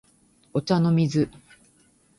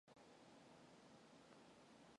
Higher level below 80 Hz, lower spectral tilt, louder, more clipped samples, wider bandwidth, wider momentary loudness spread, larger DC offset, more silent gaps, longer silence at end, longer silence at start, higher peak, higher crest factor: first, -58 dBFS vs under -90 dBFS; first, -7.5 dB/octave vs -4 dB/octave; first, -24 LUFS vs -67 LUFS; neither; about the same, 11.5 kHz vs 11 kHz; first, 9 LU vs 1 LU; neither; neither; first, 0.9 s vs 0 s; first, 0.55 s vs 0.05 s; first, -8 dBFS vs -50 dBFS; about the same, 18 dB vs 16 dB